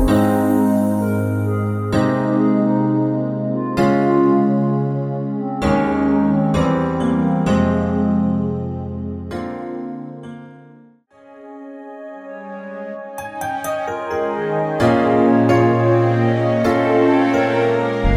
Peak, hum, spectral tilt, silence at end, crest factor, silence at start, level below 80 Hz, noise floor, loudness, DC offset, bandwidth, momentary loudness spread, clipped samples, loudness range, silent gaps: -4 dBFS; none; -8 dB/octave; 0 s; 14 dB; 0 s; -36 dBFS; -48 dBFS; -18 LUFS; under 0.1%; 16 kHz; 16 LU; under 0.1%; 16 LU; none